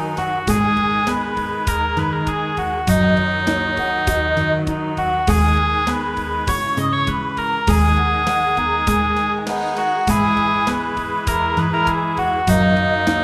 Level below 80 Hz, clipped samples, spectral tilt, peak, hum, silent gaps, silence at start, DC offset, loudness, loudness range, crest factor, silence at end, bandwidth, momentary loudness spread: -28 dBFS; under 0.1%; -5.5 dB/octave; -2 dBFS; none; none; 0 s; under 0.1%; -19 LUFS; 1 LU; 16 dB; 0 s; 15 kHz; 6 LU